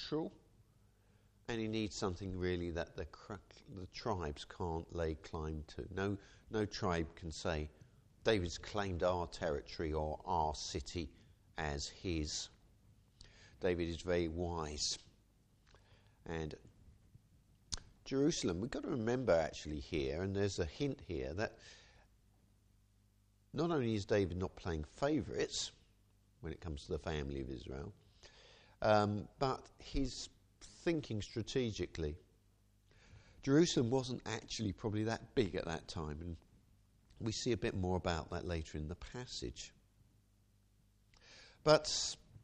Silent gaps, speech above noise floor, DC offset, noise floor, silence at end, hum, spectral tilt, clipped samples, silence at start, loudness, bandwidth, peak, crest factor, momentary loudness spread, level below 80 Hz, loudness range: none; 33 dB; under 0.1%; -71 dBFS; 0.05 s; none; -5 dB/octave; under 0.1%; 0 s; -39 LUFS; 10.5 kHz; -14 dBFS; 26 dB; 13 LU; -54 dBFS; 6 LU